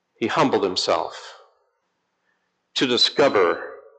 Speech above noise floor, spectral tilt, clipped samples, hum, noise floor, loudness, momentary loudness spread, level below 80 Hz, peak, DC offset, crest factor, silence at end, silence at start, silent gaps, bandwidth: 53 dB; -3.5 dB/octave; under 0.1%; none; -73 dBFS; -20 LUFS; 13 LU; -72 dBFS; -8 dBFS; under 0.1%; 16 dB; 0.2 s; 0.2 s; none; 9 kHz